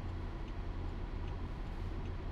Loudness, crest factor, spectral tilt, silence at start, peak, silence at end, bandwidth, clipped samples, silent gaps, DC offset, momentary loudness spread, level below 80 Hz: -44 LUFS; 10 dB; -8 dB/octave; 0 s; -30 dBFS; 0 s; 7 kHz; under 0.1%; none; under 0.1%; 1 LU; -42 dBFS